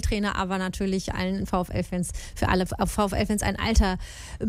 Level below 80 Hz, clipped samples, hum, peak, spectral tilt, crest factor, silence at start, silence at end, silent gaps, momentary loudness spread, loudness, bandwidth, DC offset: -32 dBFS; under 0.1%; none; -8 dBFS; -5 dB/octave; 18 dB; 0 s; 0 s; none; 6 LU; -26 LUFS; 16 kHz; under 0.1%